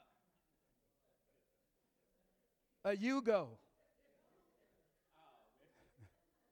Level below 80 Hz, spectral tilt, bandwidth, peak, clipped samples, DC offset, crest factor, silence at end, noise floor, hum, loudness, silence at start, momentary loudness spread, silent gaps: -86 dBFS; -5.5 dB/octave; 19 kHz; -22 dBFS; under 0.1%; under 0.1%; 24 dB; 0.45 s; -83 dBFS; none; -39 LUFS; 2.85 s; 9 LU; none